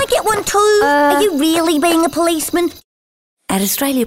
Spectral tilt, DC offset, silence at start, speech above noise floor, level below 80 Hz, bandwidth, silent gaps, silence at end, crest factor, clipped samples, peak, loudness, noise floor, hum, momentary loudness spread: -3 dB/octave; under 0.1%; 0 s; over 76 dB; -46 dBFS; 16.5 kHz; 2.84-3.37 s; 0 s; 12 dB; under 0.1%; -4 dBFS; -14 LUFS; under -90 dBFS; none; 6 LU